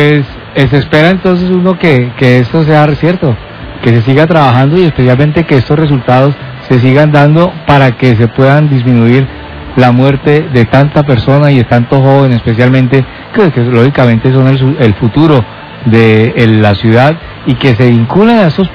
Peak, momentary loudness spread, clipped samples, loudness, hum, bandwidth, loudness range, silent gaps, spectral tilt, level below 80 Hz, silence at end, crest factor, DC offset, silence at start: 0 dBFS; 5 LU; 8%; -7 LUFS; none; 5.4 kHz; 1 LU; none; -9 dB/octave; -32 dBFS; 0 s; 6 dB; under 0.1%; 0 s